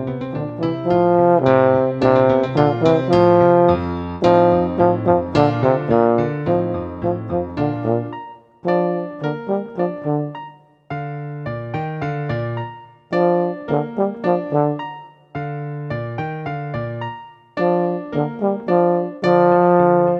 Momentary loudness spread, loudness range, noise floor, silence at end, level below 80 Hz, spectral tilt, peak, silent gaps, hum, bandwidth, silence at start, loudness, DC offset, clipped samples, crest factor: 14 LU; 10 LU; -40 dBFS; 0 s; -48 dBFS; -9 dB/octave; 0 dBFS; none; none; 7 kHz; 0 s; -18 LUFS; under 0.1%; under 0.1%; 18 dB